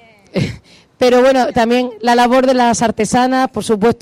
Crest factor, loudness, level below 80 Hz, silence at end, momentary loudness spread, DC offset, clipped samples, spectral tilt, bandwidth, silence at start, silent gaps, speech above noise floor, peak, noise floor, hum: 10 dB; -13 LUFS; -44 dBFS; 0.05 s; 10 LU; under 0.1%; under 0.1%; -4.5 dB/octave; 16 kHz; 0.35 s; none; 26 dB; -4 dBFS; -38 dBFS; none